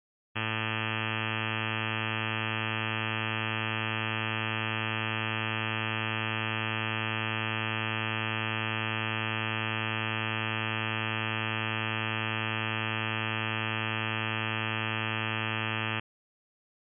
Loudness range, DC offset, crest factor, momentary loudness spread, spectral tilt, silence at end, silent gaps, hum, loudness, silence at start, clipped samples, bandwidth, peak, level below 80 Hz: 0 LU; under 0.1%; 14 dB; 0 LU; -2 dB/octave; 1 s; none; none; -31 LUFS; 0.35 s; under 0.1%; 3.5 kHz; -18 dBFS; -80 dBFS